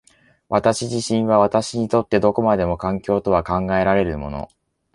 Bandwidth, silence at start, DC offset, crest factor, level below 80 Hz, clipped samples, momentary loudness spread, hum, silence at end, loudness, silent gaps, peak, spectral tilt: 11.5 kHz; 0.5 s; under 0.1%; 18 dB; -42 dBFS; under 0.1%; 8 LU; none; 0.5 s; -19 LUFS; none; -2 dBFS; -6 dB/octave